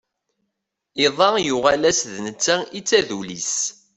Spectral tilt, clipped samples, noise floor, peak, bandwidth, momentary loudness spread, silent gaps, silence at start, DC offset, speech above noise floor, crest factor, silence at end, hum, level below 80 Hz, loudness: -2 dB/octave; under 0.1%; -79 dBFS; -2 dBFS; 8.4 kHz; 9 LU; none; 0.95 s; under 0.1%; 59 dB; 18 dB; 0.25 s; none; -58 dBFS; -20 LUFS